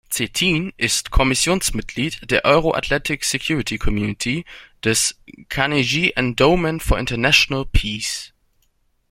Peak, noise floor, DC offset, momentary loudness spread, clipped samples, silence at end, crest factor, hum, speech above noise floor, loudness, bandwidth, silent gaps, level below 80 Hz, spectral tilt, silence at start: 0 dBFS; -64 dBFS; under 0.1%; 9 LU; under 0.1%; 0.85 s; 20 dB; none; 44 dB; -19 LUFS; 16.5 kHz; none; -30 dBFS; -3.5 dB/octave; 0.1 s